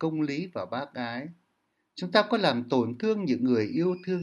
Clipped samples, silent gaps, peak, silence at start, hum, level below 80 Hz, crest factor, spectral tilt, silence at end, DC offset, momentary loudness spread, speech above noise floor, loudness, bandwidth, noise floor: under 0.1%; none; -8 dBFS; 0 s; none; -76 dBFS; 20 dB; -6.5 dB/octave; 0 s; under 0.1%; 12 LU; 48 dB; -28 LUFS; 11 kHz; -76 dBFS